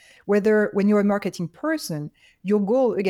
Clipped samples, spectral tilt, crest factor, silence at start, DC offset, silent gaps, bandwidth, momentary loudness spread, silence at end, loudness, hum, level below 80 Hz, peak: under 0.1%; -6.5 dB/octave; 12 dB; 0.25 s; under 0.1%; none; 13.5 kHz; 12 LU; 0 s; -22 LUFS; none; -64 dBFS; -10 dBFS